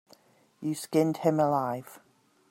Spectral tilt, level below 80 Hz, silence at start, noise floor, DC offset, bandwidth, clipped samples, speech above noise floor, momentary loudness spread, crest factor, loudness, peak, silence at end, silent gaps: -6.5 dB/octave; -74 dBFS; 0.6 s; -61 dBFS; under 0.1%; 16.5 kHz; under 0.1%; 34 dB; 11 LU; 18 dB; -28 LUFS; -12 dBFS; 0.5 s; none